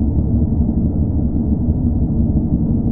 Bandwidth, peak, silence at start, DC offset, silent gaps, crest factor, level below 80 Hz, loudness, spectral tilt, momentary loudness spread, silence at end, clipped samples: 1.4 kHz; -2 dBFS; 0 s; under 0.1%; none; 12 dB; -20 dBFS; -17 LUFS; -15.5 dB/octave; 1 LU; 0 s; under 0.1%